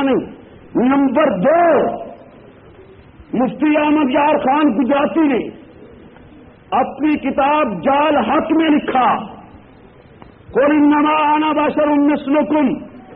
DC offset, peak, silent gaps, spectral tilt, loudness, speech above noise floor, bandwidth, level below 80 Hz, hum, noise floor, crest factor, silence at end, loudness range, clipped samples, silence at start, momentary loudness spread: under 0.1%; -4 dBFS; none; -4 dB/octave; -15 LUFS; 29 dB; 4 kHz; -50 dBFS; none; -43 dBFS; 12 dB; 0 s; 2 LU; under 0.1%; 0 s; 9 LU